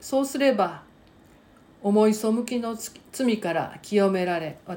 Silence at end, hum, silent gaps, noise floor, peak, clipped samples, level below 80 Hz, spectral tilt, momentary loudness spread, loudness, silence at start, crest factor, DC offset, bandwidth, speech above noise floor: 0 s; none; none; -54 dBFS; -8 dBFS; under 0.1%; -64 dBFS; -5.5 dB/octave; 11 LU; -25 LUFS; 0 s; 18 dB; under 0.1%; 17 kHz; 30 dB